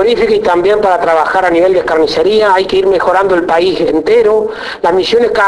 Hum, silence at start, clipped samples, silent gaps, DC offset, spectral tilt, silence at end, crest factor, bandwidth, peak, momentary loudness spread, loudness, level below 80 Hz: none; 0 s; under 0.1%; none; under 0.1%; -5 dB/octave; 0 s; 10 dB; 11 kHz; 0 dBFS; 3 LU; -10 LUFS; -40 dBFS